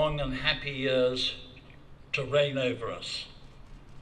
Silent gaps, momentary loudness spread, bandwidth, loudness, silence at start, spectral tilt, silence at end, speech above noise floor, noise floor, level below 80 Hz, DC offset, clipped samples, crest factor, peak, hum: none; 12 LU; 10.5 kHz; -29 LUFS; 0 s; -5 dB/octave; 0 s; 20 dB; -50 dBFS; -48 dBFS; under 0.1%; under 0.1%; 20 dB; -12 dBFS; none